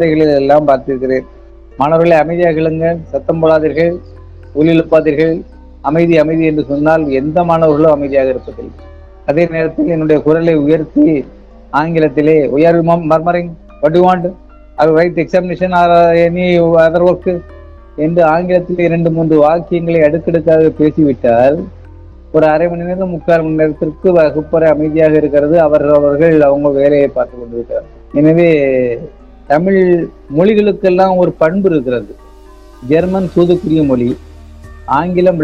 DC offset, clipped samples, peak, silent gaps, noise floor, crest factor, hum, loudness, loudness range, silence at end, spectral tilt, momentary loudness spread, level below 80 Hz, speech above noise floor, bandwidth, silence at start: under 0.1%; 0.6%; 0 dBFS; none; -36 dBFS; 10 dB; none; -11 LUFS; 2 LU; 0 s; -9 dB/octave; 9 LU; -36 dBFS; 26 dB; 7 kHz; 0 s